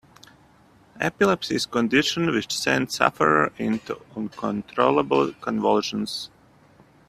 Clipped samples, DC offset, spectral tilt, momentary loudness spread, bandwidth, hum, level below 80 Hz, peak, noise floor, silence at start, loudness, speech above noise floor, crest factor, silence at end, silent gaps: under 0.1%; under 0.1%; -4.5 dB/octave; 10 LU; 15 kHz; none; -60 dBFS; -2 dBFS; -55 dBFS; 0.95 s; -23 LUFS; 32 dB; 24 dB; 0.8 s; none